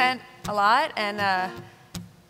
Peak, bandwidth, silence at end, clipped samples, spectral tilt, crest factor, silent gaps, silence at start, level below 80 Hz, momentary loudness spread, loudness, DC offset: -8 dBFS; 16 kHz; 0.2 s; under 0.1%; -3.5 dB/octave; 18 dB; none; 0 s; -58 dBFS; 20 LU; -24 LUFS; under 0.1%